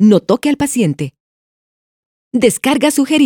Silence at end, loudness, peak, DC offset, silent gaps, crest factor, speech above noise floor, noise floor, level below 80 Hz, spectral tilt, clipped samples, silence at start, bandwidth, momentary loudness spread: 0 s; -14 LUFS; 0 dBFS; under 0.1%; 1.20-2.31 s; 14 dB; over 78 dB; under -90 dBFS; -50 dBFS; -5 dB/octave; under 0.1%; 0 s; 18.5 kHz; 9 LU